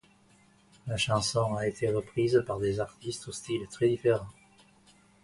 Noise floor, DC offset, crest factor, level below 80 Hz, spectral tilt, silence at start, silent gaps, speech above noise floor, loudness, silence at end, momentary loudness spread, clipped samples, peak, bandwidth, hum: -62 dBFS; under 0.1%; 18 dB; -58 dBFS; -5 dB/octave; 0.85 s; none; 33 dB; -30 LUFS; 0.9 s; 11 LU; under 0.1%; -12 dBFS; 11.5 kHz; none